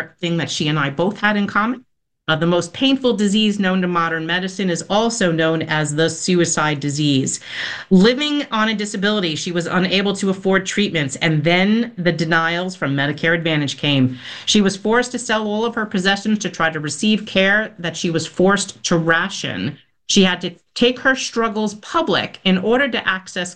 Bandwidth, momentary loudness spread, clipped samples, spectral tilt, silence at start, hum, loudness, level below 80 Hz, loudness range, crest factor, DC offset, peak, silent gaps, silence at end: 10 kHz; 7 LU; under 0.1%; -4.5 dB/octave; 0 s; none; -18 LUFS; -52 dBFS; 1 LU; 16 dB; 0.2%; -2 dBFS; none; 0 s